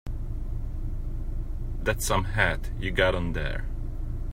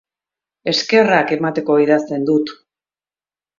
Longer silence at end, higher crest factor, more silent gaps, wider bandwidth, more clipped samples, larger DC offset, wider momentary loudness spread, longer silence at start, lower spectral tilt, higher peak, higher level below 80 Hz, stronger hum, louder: second, 0 s vs 1.05 s; about the same, 20 dB vs 18 dB; neither; first, 16 kHz vs 7.6 kHz; neither; neither; first, 12 LU vs 7 LU; second, 0.05 s vs 0.65 s; about the same, -4.5 dB/octave vs -5 dB/octave; second, -6 dBFS vs 0 dBFS; first, -30 dBFS vs -64 dBFS; neither; second, -30 LUFS vs -16 LUFS